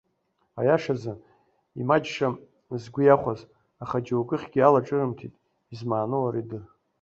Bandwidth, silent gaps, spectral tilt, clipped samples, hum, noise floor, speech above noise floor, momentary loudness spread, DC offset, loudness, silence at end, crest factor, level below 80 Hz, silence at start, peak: 7.6 kHz; none; -7.5 dB/octave; under 0.1%; none; -72 dBFS; 48 dB; 20 LU; under 0.1%; -25 LUFS; 0.35 s; 22 dB; -62 dBFS; 0.55 s; -4 dBFS